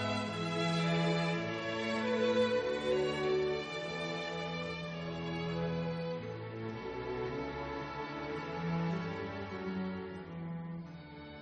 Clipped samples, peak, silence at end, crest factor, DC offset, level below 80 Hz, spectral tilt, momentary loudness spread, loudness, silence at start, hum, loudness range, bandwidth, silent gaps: under 0.1%; -20 dBFS; 0 s; 16 dB; under 0.1%; -62 dBFS; -6 dB/octave; 11 LU; -36 LUFS; 0 s; none; 6 LU; 9.4 kHz; none